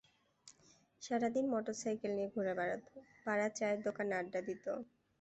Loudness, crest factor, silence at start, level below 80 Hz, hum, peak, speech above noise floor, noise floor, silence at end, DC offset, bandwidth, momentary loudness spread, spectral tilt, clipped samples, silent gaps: -39 LUFS; 16 dB; 0.45 s; -80 dBFS; none; -24 dBFS; 31 dB; -69 dBFS; 0.35 s; under 0.1%; 8.2 kHz; 10 LU; -5 dB/octave; under 0.1%; none